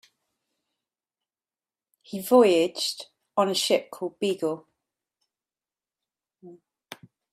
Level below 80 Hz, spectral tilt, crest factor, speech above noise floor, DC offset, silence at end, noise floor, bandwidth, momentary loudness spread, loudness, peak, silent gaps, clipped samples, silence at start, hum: -76 dBFS; -3.5 dB/octave; 22 dB; over 67 dB; under 0.1%; 0.4 s; under -90 dBFS; 15.5 kHz; 20 LU; -24 LUFS; -6 dBFS; none; under 0.1%; 2.1 s; none